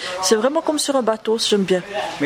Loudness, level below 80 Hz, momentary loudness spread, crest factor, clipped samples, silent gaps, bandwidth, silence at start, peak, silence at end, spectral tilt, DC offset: -19 LUFS; -60 dBFS; 4 LU; 16 dB; under 0.1%; none; 16 kHz; 0 s; -4 dBFS; 0 s; -3 dB/octave; under 0.1%